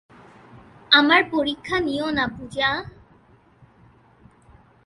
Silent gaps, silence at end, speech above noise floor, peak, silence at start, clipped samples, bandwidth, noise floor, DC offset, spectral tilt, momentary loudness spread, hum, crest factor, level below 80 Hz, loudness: none; 1.95 s; 33 dB; 0 dBFS; 0.55 s; under 0.1%; 11.5 kHz; -55 dBFS; under 0.1%; -4.5 dB/octave; 12 LU; none; 24 dB; -52 dBFS; -20 LUFS